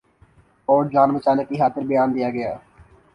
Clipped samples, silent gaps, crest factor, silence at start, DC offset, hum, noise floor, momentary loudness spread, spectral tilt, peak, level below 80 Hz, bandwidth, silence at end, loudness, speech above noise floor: under 0.1%; none; 18 dB; 0.7 s; under 0.1%; none; -55 dBFS; 12 LU; -9 dB/octave; -4 dBFS; -58 dBFS; 10 kHz; 0.55 s; -20 LUFS; 36 dB